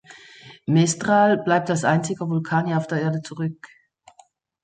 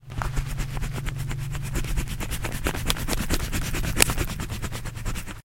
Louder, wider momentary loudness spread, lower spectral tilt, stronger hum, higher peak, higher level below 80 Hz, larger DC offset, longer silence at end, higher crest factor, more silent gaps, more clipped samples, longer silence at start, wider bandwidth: first, -21 LUFS vs -28 LUFS; about the same, 12 LU vs 12 LU; first, -5.5 dB/octave vs -3.5 dB/octave; neither; second, -6 dBFS vs 0 dBFS; second, -64 dBFS vs -30 dBFS; neither; first, 0.95 s vs 0.1 s; second, 18 dB vs 26 dB; neither; neither; about the same, 0.1 s vs 0 s; second, 9.4 kHz vs 17 kHz